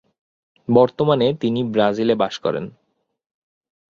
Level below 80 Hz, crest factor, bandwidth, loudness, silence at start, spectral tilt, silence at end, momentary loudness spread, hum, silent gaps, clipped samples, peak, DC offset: -58 dBFS; 20 dB; 7.4 kHz; -19 LUFS; 0.7 s; -7 dB/octave; 1.25 s; 11 LU; none; none; under 0.1%; -2 dBFS; under 0.1%